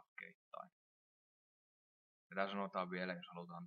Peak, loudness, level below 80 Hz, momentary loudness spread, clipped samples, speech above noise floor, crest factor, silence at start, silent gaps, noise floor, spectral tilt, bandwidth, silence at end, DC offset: -24 dBFS; -45 LUFS; under -90 dBFS; 14 LU; under 0.1%; over 46 dB; 24 dB; 0.2 s; 0.35-0.51 s, 0.72-2.30 s; under -90 dBFS; -4 dB/octave; 6.4 kHz; 0 s; under 0.1%